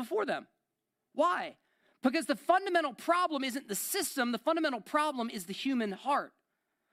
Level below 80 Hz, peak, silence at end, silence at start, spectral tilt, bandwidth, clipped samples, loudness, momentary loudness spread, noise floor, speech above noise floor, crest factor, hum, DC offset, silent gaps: -84 dBFS; -14 dBFS; 0.65 s; 0 s; -3 dB/octave; 16 kHz; under 0.1%; -32 LUFS; 8 LU; -86 dBFS; 54 dB; 20 dB; none; under 0.1%; none